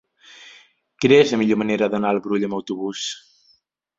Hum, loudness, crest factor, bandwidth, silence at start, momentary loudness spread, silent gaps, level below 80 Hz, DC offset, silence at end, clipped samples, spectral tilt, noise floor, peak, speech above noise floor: none; -20 LUFS; 20 dB; 7.8 kHz; 0.4 s; 13 LU; none; -62 dBFS; under 0.1%; 0.8 s; under 0.1%; -5 dB/octave; -62 dBFS; -2 dBFS; 43 dB